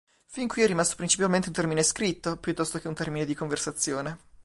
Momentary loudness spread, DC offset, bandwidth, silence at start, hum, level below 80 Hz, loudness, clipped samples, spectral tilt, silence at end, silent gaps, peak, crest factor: 9 LU; under 0.1%; 11.5 kHz; 0.3 s; none; -56 dBFS; -27 LUFS; under 0.1%; -3.5 dB/octave; 0.05 s; none; -8 dBFS; 20 dB